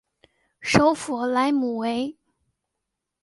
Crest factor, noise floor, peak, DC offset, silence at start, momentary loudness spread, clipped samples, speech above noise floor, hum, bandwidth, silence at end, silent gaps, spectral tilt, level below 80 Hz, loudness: 24 dB; -82 dBFS; -2 dBFS; under 0.1%; 0.6 s; 11 LU; under 0.1%; 60 dB; none; 11.5 kHz; 1.1 s; none; -5 dB/octave; -54 dBFS; -23 LUFS